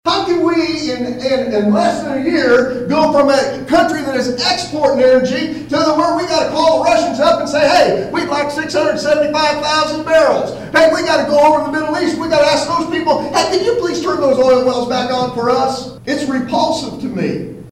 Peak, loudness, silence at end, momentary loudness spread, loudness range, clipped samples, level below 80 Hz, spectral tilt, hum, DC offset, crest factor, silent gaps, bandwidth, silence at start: -2 dBFS; -14 LUFS; 0 s; 7 LU; 2 LU; under 0.1%; -46 dBFS; -4 dB/octave; none; under 0.1%; 12 dB; none; 15 kHz; 0.05 s